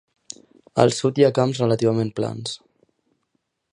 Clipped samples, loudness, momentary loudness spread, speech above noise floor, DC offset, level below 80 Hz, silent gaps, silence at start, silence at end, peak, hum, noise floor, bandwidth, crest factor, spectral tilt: under 0.1%; -21 LUFS; 22 LU; 54 dB; under 0.1%; -60 dBFS; none; 0.75 s; 1.15 s; 0 dBFS; none; -73 dBFS; 11 kHz; 22 dB; -6 dB/octave